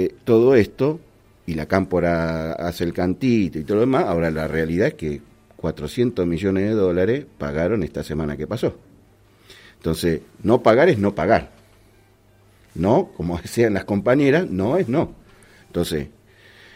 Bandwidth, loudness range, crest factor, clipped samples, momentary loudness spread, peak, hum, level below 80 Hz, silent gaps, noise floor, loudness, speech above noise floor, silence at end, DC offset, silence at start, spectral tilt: 16 kHz; 3 LU; 20 dB; under 0.1%; 12 LU; -2 dBFS; none; -46 dBFS; none; -54 dBFS; -21 LUFS; 34 dB; 0.7 s; under 0.1%; 0 s; -7 dB/octave